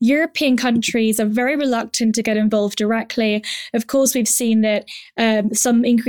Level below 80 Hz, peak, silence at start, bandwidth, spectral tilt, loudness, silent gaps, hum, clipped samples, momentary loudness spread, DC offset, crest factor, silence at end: -60 dBFS; -4 dBFS; 0 s; 19.5 kHz; -3.5 dB/octave; -18 LUFS; none; none; under 0.1%; 5 LU; 0.1%; 12 dB; 0 s